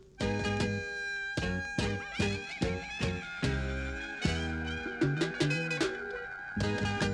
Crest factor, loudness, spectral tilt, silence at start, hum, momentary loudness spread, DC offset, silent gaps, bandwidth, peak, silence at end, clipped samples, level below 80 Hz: 18 dB; -33 LUFS; -5 dB/octave; 0 s; none; 5 LU; under 0.1%; none; 12 kHz; -14 dBFS; 0 s; under 0.1%; -44 dBFS